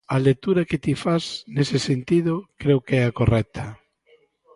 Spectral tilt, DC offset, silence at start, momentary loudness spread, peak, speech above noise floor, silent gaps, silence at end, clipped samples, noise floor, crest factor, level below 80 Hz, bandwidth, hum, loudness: -7 dB/octave; under 0.1%; 0.1 s; 7 LU; -6 dBFS; 38 dB; none; 0.8 s; under 0.1%; -60 dBFS; 18 dB; -44 dBFS; 11.5 kHz; none; -22 LUFS